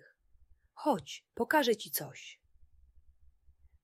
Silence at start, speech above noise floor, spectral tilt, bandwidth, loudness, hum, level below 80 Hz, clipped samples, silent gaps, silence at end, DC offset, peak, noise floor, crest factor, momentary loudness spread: 0.75 s; 31 dB; -3 dB/octave; 16 kHz; -32 LUFS; none; -68 dBFS; under 0.1%; none; 1.5 s; under 0.1%; -16 dBFS; -64 dBFS; 22 dB; 18 LU